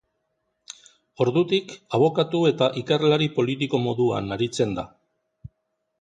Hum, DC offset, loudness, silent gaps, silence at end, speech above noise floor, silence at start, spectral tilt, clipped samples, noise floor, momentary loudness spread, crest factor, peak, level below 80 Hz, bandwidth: none; under 0.1%; -23 LUFS; none; 0.55 s; 54 dB; 1.2 s; -6 dB/octave; under 0.1%; -76 dBFS; 17 LU; 18 dB; -6 dBFS; -58 dBFS; 9.4 kHz